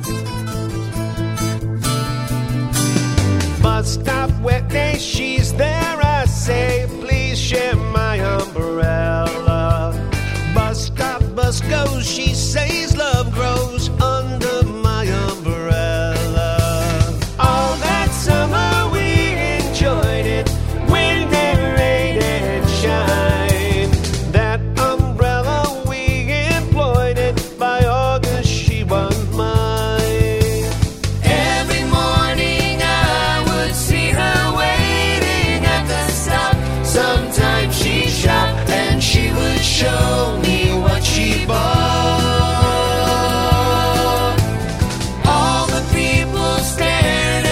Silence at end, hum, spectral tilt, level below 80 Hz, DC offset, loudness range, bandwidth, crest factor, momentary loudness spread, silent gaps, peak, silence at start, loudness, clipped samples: 0 s; none; -5 dB/octave; -26 dBFS; 0.3%; 3 LU; 16 kHz; 16 dB; 5 LU; none; 0 dBFS; 0 s; -17 LUFS; under 0.1%